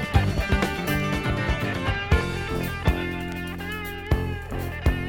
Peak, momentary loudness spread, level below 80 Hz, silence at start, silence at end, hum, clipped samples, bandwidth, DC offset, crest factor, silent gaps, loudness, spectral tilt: -6 dBFS; 8 LU; -30 dBFS; 0 s; 0 s; none; under 0.1%; 18 kHz; under 0.1%; 20 dB; none; -26 LUFS; -6 dB/octave